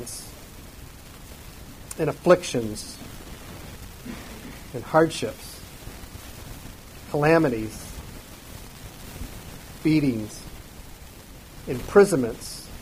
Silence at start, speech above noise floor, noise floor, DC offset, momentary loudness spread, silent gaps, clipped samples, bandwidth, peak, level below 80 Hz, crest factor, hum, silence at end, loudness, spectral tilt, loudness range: 0 s; 22 dB; -44 dBFS; under 0.1%; 23 LU; none; under 0.1%; 15.5 kHz; -4 dBFS; -46 dBFS; 22 dB; none; 0 s; -23 LUFS; -5.5 dB/octave; 5 LU